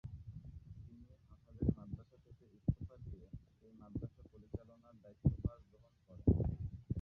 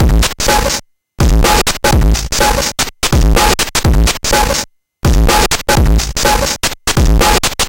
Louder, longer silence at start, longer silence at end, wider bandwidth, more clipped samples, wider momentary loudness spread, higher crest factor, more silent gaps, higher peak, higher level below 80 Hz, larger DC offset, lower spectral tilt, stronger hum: second, -42 LUFS vs -12 LUFS; about the same, 0.05 s vs 0 s; about the same, 0 s vs 0 s; second, 2.6 kHz vs 17.5 kHz; neither; first, 25 LU vs 5 LU; first, 24 dB vs 12 dB; neither; second, -18 dBFS vs 0 dBFS; second, -50 dBFS vs -14 dBFS; neither; first, -13.5 dB/octave vs -3.5 dB/octave; neither